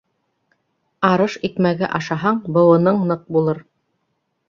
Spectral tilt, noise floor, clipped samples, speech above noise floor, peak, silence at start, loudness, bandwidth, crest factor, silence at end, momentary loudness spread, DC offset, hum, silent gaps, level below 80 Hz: -7.5 dB/octave; -71 dBFS; under 0.1%; 54 dB; -2 dBFS; 1 s; -18 LUFS; 7.2 kHz; 18 dB; 0.9 s; 8 LU; under 0.1%; none; none; -60 dBFS